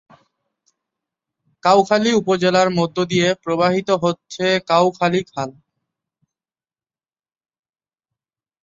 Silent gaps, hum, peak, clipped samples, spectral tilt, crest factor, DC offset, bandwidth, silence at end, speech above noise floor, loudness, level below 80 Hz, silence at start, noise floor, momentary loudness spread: none; none; -2 dBFS; under 0.1%; -5 dB/octave; 20 dB; under 0.1%; 7.8 kHz; 3.1 s; over 73 dB; -18 LUFS; -60 dBFS; 1.65 s; under -90 dBFS; 7 LU